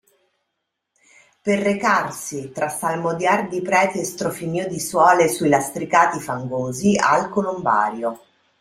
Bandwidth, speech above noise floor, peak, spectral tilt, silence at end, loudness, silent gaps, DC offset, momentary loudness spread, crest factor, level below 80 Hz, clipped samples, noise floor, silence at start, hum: 16 kHz; 58 dB; -2 dBFS; -4.5 dB/octave; 0.45 s; -20 LUFS; none; under 0.1%; 10 LU; 20 dB; -60 dBFS; under 0.1%; -78 dBFS; 1.45 s; none